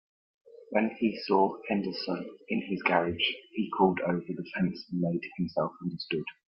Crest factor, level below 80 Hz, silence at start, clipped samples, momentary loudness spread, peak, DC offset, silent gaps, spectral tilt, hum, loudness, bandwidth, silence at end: 22 dB; -68 dBFS; 0.5 s; under 0.1%; 8 LU; -8 dBFS; under 0.1%; none; -9 dB/octave; none; -30 LUFS; 5.8 kHz; 0.15 s